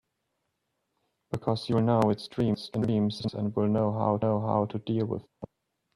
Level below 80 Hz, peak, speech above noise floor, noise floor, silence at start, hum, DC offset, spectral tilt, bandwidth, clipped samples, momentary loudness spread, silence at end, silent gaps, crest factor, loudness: -62 dBFS; -12 dBFS; 53 dB; -80 dBFS; 1.3 s; none; under 0.1%; -8.5 dB/octave; 11 kHz; under 0.1%; 10 LU; 0.5 s; none; 18 dB; -28 LUFS